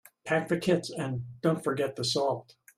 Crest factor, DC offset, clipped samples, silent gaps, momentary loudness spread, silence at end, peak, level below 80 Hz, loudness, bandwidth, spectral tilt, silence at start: 18 dB; under 0.1%; under 0.1%; none; 7 LU; 0.35 s; -12 dBFS; -66 dBFS; -30 LUFS; 15 kHz; -5 dB/octave; 0.25 s